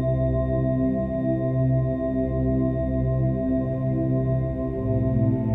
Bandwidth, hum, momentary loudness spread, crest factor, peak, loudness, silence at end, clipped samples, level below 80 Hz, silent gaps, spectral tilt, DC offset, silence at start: 3.8 kHz; none; 3 LU; 12 dB; -12 dBFS; -24 LUFS; 0 s; under 0.1%; -34 dBFS; none; -12.5 dB/octave; under 0.1%; 0 s